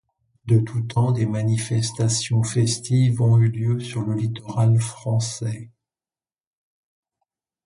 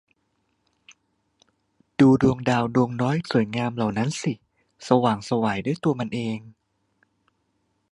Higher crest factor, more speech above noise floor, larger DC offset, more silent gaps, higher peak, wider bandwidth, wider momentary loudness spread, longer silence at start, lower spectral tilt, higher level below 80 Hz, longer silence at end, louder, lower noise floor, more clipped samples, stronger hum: second, 14 dB vs 22 dB; first, over 70 dB vs 49 dB; neither; neither; second, -8 dBFS vs -2 dBFS; about the same, 11.5 kHz vs 11 kHz; second, 8 LU vs 12 LU; second, 0.45 s vs 2 s; about the same, -6 dB/octave vs -6.5 dB/octave; about the same, -54 dBFS vs -56 dBFS; first, 2 s vs 1.4 s; about the same, -22 LUFS vs -23 LUFS; first, under -90 dBFS vs -72 dBFS; neither; neither